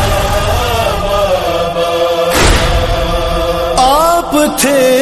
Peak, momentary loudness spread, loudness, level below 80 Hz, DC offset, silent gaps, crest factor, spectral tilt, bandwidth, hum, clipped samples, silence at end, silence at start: 0 dBFS; 5 LU; -11 LUFS; -20 dBFS; under 0.1%; none; 10 dB; -4 dB/octave; 13.5 kHz; none; under 0.1%; 0 s; 0 s